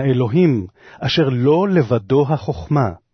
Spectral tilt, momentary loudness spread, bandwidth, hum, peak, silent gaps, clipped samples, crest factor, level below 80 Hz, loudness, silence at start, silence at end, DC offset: -8 dB/octave; 7 LU; 6.4 kHz; none; -4 dBFS; none; under 0.1%; 14 dB; -46 dBFS; -17 LUFS; 0 s; 0.15 s; under 0.1%